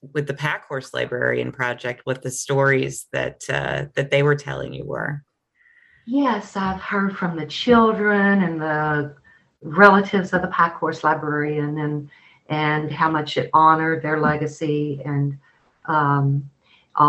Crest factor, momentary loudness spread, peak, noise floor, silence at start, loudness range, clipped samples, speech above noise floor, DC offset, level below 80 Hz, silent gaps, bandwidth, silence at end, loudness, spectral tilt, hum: 20 dB; 12 LU; 0 dBFS; -59 dBFS; 0.05 s; 6 LU; under 0.1%; 39 dB; under 0.1%; -54 dBFS; none; 12.5 kHz; 0 s; -21 LUFS; -6 dB/octave; none